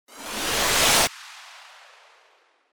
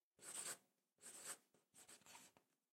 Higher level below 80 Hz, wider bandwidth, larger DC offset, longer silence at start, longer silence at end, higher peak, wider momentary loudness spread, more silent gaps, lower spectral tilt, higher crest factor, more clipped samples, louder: first, -48 dBFS vs under -90 dBFS; first, over 20 kHz vs 16 kHz; neither; about the same, 0.1 s vs 0.2 s; first, 1.1 s vs 0.35 s; first, -6 dBFS vs -38 dBFS; first, 24 LU vs 14 LU; neither; about the same, -0.5 dB/octave vs 0.5 dB/octave; about the same, 20 dB vs 22 dB; neither; first, -20 LUFS vs -55 LUFS